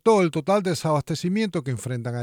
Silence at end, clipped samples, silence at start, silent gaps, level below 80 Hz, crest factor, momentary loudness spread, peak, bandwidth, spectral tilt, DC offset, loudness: 0 s; under 0.1%; 0.05 s; none; -60 dBFS; 16 dB; 9 LU; -6 dBFS; 18 kHz; -6 dB/octave; under 0.1%; -24 LUFS